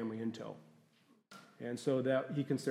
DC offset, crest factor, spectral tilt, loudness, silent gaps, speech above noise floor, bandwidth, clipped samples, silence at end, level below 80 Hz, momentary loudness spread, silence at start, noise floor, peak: under 0.1%; 18 dB; -6.5 dB/octave; -37 LUFS; none; 33 dB; 14.5 kHz; under 0.1%; 0 s; -88 dBFS; 24 LU; 0 s; -70 dBFS; -20 dBFS